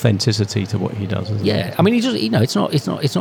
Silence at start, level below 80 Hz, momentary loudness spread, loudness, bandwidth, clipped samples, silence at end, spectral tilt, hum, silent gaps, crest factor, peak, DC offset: 0 s; -56 dBFS; 7 LU; -18 LUFS; 18 kHz; under 0.1%; 0 s; -6 dB/octave; none; none; 16 dB; -2 dBFS; under 0.1%